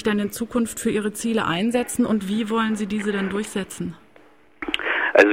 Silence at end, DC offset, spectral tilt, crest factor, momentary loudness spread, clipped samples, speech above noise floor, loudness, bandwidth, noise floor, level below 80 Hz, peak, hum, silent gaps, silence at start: 0 s; 0.2%; -4.5 dB/octave; 20 dB; 7 LU; under 0.1%; 30 dB; -23 LUFS; 16.5 kHz; -53 dBFS; -54 dBFS; -2 dBFS; none; none; 0 s